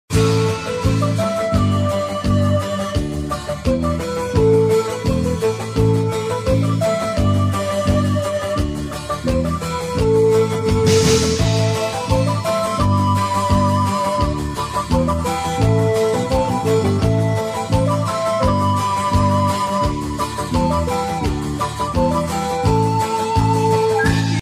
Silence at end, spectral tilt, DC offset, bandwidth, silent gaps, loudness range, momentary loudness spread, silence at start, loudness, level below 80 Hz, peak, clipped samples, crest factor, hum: 0 s; -6 dB/octave; under 0.1%; 15.5 kHz; none; 3 LU; 6 LU; 0.1 s; -18 LUFS; -32 dBFS; -2 dBFS; under 0.1%; 16 dB; none